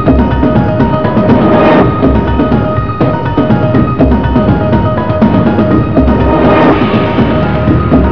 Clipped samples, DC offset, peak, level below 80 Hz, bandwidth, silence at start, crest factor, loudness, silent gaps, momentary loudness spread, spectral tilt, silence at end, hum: 0.9%; 4%; 0 dBFS; -18 dBFS; 5.4 kHz; 0 s; 8 dB; -9 LUFS; none; 4 LU; -10 dB/octave; 0 s; none